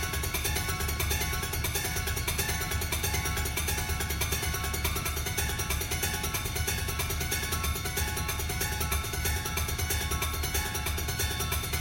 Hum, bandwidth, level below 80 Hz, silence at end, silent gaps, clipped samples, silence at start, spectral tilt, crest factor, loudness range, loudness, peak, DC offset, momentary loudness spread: none; 17 kHz; -36 dBFS; 0 s; none; under 0.1%; 0 s; -3 dB/octave; 16 dB; 1 LU; -30 LUFS; -14 dBFS; under 0.1%; 2 LU